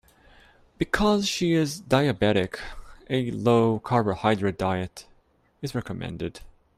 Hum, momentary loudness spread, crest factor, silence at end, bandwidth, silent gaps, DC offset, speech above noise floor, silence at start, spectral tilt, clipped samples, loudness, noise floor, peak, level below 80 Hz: none; 14 LU; 20 dB; 0.25 s; 15 kHz; none; under 0.1%; 38 dB; 0.8 s; -5.5 dB/octave; under 0.1%; -25 LUFS; -63 dBFS; -6 dBFS; -48 dBFS